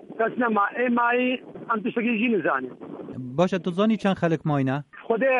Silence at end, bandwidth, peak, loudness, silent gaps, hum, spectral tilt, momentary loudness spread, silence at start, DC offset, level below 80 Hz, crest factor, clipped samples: 0 s; 9.2 kHz; -8 dBFS; -24 LUFS; none; none; -7.5 dB/octave; 10 LU; 0 s; under 0.1%; -66 dBFS; 16 dB; under 0.1%